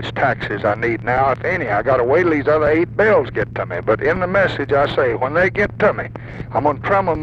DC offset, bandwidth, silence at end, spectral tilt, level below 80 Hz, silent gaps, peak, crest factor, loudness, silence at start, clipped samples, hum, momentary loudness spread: under 0.1%; 8 kHz; 0 s; -7.5 dB/octave; -40 dBFS; none; -4 dBFS; 14 dB; -17 LUFS; 0 s; under 0.1%; none; 7 LU